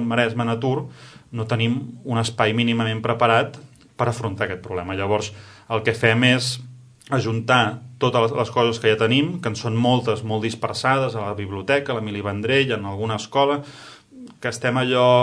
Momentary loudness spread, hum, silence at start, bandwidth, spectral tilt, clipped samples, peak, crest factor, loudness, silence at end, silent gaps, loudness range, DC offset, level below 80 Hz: 10 LU; none; 0 s; 11 kHz; -5.5 dB/octave; under 0.1%; 0 dBFS; 22 dB; -21 LUFS; 0 s; none; 3 LU; under 0.1%; -58 dBFS